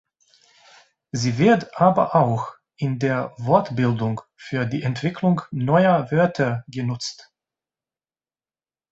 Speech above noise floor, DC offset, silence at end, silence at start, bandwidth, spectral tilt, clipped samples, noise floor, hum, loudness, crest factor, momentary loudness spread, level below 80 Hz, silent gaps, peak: over 70 dB; under 0.1%; 1.7 s; 1.15 s; 8.2 kHz; -7 dB/octave; under 0.1%; under -90 dBFS; none; -21 LUFS; 20 dB; 11 LU; -58 dBFS; none; -2 dBFS